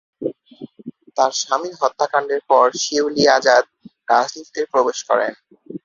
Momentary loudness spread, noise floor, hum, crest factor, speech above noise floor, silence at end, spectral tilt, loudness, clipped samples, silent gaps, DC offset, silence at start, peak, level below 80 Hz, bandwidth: 21 LU; -40 dBFS; none; 18 dB; 22 dB; 0.05 s; -2.5 dB/octave; -18 LUFS; under 0.1%; none; under 0.1%; 0.2 s; 0 dBFS; -64 dBFS; 7.6 kHz